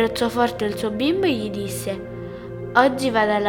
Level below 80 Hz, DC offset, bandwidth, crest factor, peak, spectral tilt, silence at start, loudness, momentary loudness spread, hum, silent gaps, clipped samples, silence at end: -48 dBFS; under 0.1%; 18.5 kHz; 22 dB; 0 dBFS; -5 dB/octave; 0 s; -21 LUFS; 15 LU; none; none; under 0.1%; 0 s